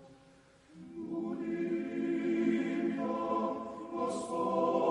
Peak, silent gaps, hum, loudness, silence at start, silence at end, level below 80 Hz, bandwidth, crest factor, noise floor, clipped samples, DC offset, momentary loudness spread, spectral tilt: -18 dBFS; none; none; -34 LUFS; 0 s; 0 s; -74 dBFS; 11 kHz; 18 dB; -61 dBFS; under 0.1%; under 0.1%; 10 LU; -6.5 dB/octave